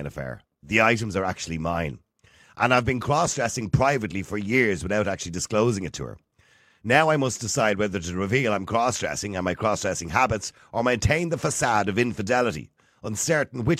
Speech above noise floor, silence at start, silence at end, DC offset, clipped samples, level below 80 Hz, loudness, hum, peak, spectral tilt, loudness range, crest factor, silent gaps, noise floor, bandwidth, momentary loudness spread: 36 dB; 0 s; 0 s; under 0.1%; under 0.1%; -46 dBFS; -24 LUFS; none; -4 dBFS; -4.5 dB/octave; 1 LU; 20 dB; none; -60 dBFS; 15.5 kHz; 10 LU